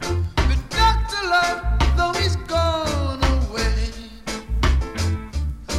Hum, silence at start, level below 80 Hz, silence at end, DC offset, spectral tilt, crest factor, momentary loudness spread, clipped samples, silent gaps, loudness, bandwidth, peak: none; 0 s; -24 dBFS; 0 s; under 0.1%; -5 dB/octave; 16 dB; 10 LU; under 0.1%; none; -22 LUFS; 14 kHz; -4 dBFS